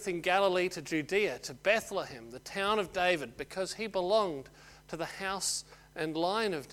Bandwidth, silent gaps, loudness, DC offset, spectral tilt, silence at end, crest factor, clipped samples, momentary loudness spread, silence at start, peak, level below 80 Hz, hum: 16.5 kHz; none; -32 LUFS; under 0.1%; -3 dB/octave; 0 s; 20 dB; under 0.1%; 11 LU; 0 s; -12 dBFS; -62 dBFS; none